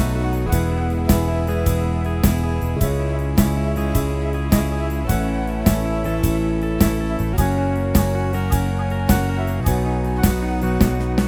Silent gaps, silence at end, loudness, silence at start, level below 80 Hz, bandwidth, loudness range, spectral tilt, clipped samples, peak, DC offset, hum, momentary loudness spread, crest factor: none; 0 s; -20 LUFS; 0 s; -24 dBFS; over 20 kHz; 1 LU; -6.5 dB/octave; under 0.1%; -2 dBFS; under 0.1%; none; 3 LU; 18 dB